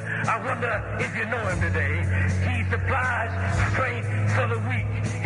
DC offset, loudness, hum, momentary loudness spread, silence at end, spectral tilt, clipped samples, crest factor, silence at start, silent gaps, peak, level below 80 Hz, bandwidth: under 0.1%; -25 LUFS; none; 3 LU; 0 s; -6.5 dB/octave; under 0.1%; 16 dB; 0 s; none; -8 dBFS; -42 dBFS; 11 kHz